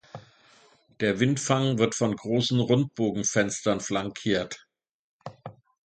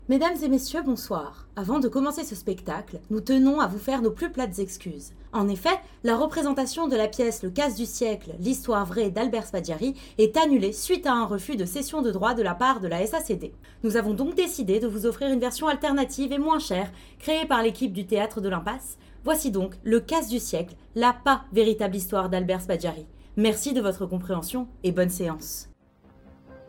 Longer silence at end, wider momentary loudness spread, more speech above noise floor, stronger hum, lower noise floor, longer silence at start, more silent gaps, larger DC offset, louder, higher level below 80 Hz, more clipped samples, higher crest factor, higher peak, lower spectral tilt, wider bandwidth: first, 0.35 s vs 0 s; first, 22 LU vs 10 LU; first, 34 dB vs 30 dB; neither; about the same, -59 dBFS vs -56 dBFS; first, 0.15 s vs 0 s; first, 4.91-5.20 s vs none; neither; about the same, -26 LUFS vs -26 LUFS; second, -60 dBFS vs -48 dBFS; neither; about the same, 20 dB vs 18 dB; about the same, -6 dBFS vs -8 dBFS; about the same, -4.5 dB/octave vs -4.5 dB/octave; second, 9.4 kHz vs 19 kHz